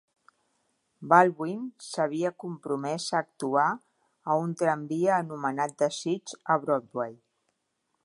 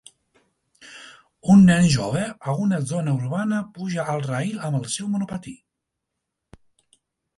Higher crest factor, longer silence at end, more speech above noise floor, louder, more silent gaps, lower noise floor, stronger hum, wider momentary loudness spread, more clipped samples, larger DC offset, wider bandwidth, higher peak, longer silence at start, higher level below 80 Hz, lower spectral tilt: first, 24 dB vs 18 dB; second, 0.9 s vs 1.8 s; second, 51 dB vs 61 dB; second, -28 LUFS vs -21 LUFS; neither; about the same, -78 dBFS vs -81 dBFS; neither; second, 13 LU vs 18 LU; neither; neither; about the same, 11.5 kHz vs 11.5 kHz; about the same, -4 dBFS vs -4 dBFS; first, 1 s vs 0.85 s; second, -82 dBFS vs -54 dBFS; about the same, -5 dB/octave vs -6 dB/octave